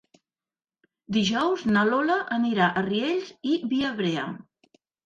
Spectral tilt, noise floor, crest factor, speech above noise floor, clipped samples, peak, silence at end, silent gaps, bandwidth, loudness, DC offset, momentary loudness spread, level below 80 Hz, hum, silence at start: -5.5 dB/octave; under -90 dBFS; 16 dB; over 66 dB; under 0.1%; -10 dBFS; 0.7 s; none; 7.6 kHz; -25 LUFS; under 0.1%; 7 LU; -64 dBFS; none; 1.1 s